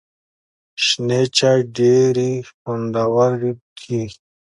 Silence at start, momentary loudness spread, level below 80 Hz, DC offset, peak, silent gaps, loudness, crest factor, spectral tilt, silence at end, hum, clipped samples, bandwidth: 0.8 s; 13 LU; -58 dBFS; under 0.1%; -2 dBFS; 2.54-2.65 s, 3.61-3.76 s; -18 LUFS; 16 dB; -5 dB/octave; 0.3 s; none; under 0.1%; 11.5 kHz